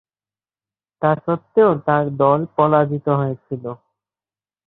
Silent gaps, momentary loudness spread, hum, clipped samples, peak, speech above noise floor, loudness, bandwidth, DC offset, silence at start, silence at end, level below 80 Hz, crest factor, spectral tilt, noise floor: none; 14 LU; none; under 0.1%; -2 dBFS; over 72 dB; -18 LUFS; 4.1 kHz; under 0.1%; 1 s; 0.95 s; -60 dBFS; 18 dB; -12.5 dB/octave; under -90 dBFS